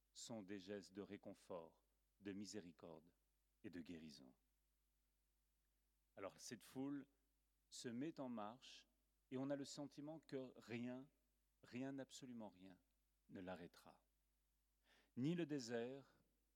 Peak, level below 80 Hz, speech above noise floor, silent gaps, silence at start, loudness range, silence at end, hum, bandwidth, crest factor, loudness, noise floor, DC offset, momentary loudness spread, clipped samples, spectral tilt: -36 dBFS; -88 dBFS; 34 dB; none; 0.15 s; 9 LU; 0.45 s; none; 17.5 kHz; 20 dB; -54 LUFS; -87 dBFS; under 0.1%; 14 LU; under 0.1%; -5.5 dB/octave